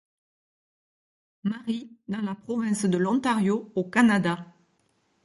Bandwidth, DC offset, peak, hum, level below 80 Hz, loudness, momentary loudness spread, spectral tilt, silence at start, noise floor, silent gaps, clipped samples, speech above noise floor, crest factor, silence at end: 11.5 kHz; under 0.1%; -8 dBFS; none; -70 dBFS; -26 LUFS; 12 LU; -6 dB/octave; 1.45 s; -69 dBFS; none; under 0.1%; 44 dB; 20 dB; 0.75 s